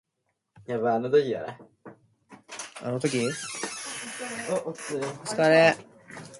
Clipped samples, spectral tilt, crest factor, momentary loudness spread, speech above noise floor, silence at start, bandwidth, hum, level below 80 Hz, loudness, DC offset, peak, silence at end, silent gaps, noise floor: under 0.1%; -4 dB/octave; 22 dB; 19 LU; 53 dB; 0.6 s; 11.5 kHz; none; -72 dBFS; -26 LUFS; under 0.1%; -6 dBFS; 0 s; none; -79 dBFS